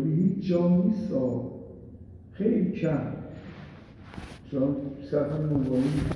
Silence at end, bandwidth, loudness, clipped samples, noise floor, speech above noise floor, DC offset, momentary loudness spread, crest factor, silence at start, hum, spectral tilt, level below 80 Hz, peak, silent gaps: 0 s; 11 kHz; -27 LUFS; under 0.1%; -46 dBFS; 20 dB; under 0.1%; 21 LU; 16 dB; 0 s; none; -9.5 dB/octave; -50 dBFS; -12 dBFS; none